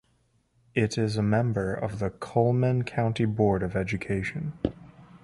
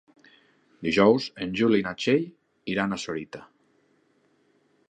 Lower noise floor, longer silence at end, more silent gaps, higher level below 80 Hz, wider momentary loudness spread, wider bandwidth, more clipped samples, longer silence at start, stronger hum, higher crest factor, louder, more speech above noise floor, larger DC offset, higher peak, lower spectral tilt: about the same, -68 dBFS vs -66 dBFS; second, 0.05 s vs 1.45 s; neither; first, -50 dBFS vs -62 dBFS; second, 8 LU vs 19 LU; first, 11.5 kHz vs 9.4 kHz; neither; about the same, 0.75 s vs 0.8 s; neither; about the same, 18 dB vs 22 dB; about the same, -27 LUFS vs -25 LUFS; about the same, 42 dB vs 42 dB; neither; about the same, -8 dBFS vs -6 dBFS; first, -7.5 dB/octave vs -5.5 dB/octave